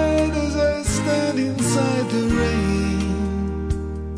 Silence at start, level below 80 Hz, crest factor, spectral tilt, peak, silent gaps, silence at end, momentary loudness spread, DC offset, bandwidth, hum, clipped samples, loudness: 0 s; -30 dBFS; 12 dB; -5.5 dB/octave; -8 dBFS; none; 0 s; 5 LU; under 0.1%; 11 kHz; none; under 0.1%; -21 LUFS